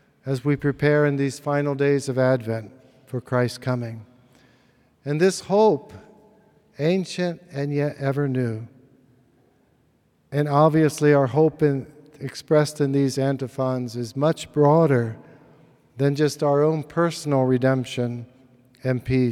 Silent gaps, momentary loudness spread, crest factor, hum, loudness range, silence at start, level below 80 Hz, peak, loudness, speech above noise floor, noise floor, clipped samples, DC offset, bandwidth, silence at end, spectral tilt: none; 12 LU; 18 dB; none; 6 LU; 0.25 s; -58 dBFS; -4 dBFS; -22 LUFS; 42 dB; -63 dBFS; under 0.1%; under 0.1%; 14 kHz; 0 s; -7 dB/octave